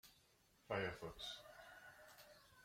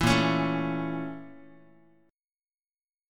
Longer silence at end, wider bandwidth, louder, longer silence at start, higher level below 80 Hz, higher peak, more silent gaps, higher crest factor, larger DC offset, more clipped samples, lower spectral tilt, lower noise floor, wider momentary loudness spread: second, 0 s vs 1.7 s; about the same, 16.5 kHz vs 16.5 kHz; second, -50 LUFS vs -28 LUFS; about the same, 0.05 s vs 0 s; second, -74 dBFS vs -50 dBFS; second, -30 dBFS vs -8 dBFS; neither; about the same, 24 dB vs 22 dB; neither; neither; second, -4 dB/octave vs -5.5 dB/octave; second, -75 dBFS vs under -90 dBFS; about the same, 18 LU vs 20 LU